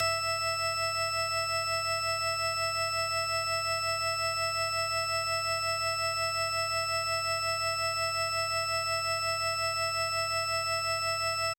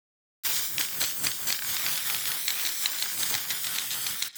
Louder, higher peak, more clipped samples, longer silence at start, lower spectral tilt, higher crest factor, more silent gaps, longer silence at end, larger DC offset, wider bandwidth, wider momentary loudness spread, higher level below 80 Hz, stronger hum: second, -29 LUFS vs -26 LUFS; second, -18 dBFS vs -10 dBFS; neither; second, 0 s vs 0.45 s; first, -0.5 dB/octave vs 1.5 dB/octave; second, 12 dB vs 20 dB; neither; about the same, 0.05 s vs 0 s; neither; about the same, 19.5 kHz vs over 20 kHz; about the same, 0 LU vs 2 LU; first, -62 dBFS vs -74 dBFS; neither